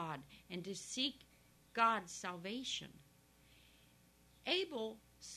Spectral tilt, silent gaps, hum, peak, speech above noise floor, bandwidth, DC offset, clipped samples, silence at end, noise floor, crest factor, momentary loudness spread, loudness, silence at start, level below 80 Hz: -2.5 dB/octave; none; 60 Hz at -75 dBFS; -20 dBFS; 28 dB; 13.5 kHz; under 0.1%; under 0.1%; 0 s; -68 dBFS; 24 dB; 16 LU; -41 LUFS; 0 s; -74 dBFS